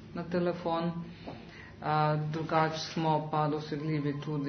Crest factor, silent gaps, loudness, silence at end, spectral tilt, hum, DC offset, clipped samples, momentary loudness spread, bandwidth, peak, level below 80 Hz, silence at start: 20 dB; none; -32 LUFS; 0 s; -5.5 dB/octave; none; under 0.1%; under 0.1%; 15 LU; 6.4 kHz; -12 dBFS; -62 dBFS; 0 s